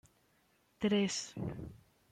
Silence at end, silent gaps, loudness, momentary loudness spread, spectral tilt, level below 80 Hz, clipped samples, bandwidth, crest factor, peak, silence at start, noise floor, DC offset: 0.35 s; none; -36 LUFS; 16 LU; -4.5 dB/octave; -64 dBFS; under 0.1%; 10.5 kHz; 16 dB; -22 dBFS; 0.8 s; -73 dBFS; under 0.1%